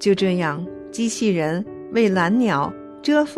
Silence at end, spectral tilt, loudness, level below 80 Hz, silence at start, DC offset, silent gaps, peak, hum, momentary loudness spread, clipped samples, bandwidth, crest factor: 0 s; -5.5 dB/octave; -21 LUFS; -58 dBFS; 0 s; under 0.1%; none; -6 dBFS; none; 10 LU; under 0.1%; 12.5 kHz; 14 dB